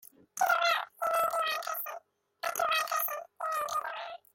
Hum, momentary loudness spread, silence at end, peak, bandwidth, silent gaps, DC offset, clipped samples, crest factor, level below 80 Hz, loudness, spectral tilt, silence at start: none; 12 LU; 0.15 s; -14 dBFS; 17 kHz; none; under 0.1%; under 0.1%; 18 dB; -76 dBFS; -31 LUFS; 1 dB/octave; 0.35 s